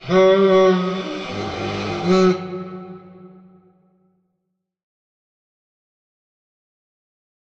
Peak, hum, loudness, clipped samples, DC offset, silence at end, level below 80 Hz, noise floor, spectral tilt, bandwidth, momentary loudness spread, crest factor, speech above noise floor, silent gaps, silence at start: -6 dBFS; none; -18 LUFS; under 0.1%; under 0.1%; 4.25 s; -56 dBFS; -76 dBFS; -6.5 dB/octave; 7.4 kHz; 18 LU; 16 dB; 62 dB; none; 0 s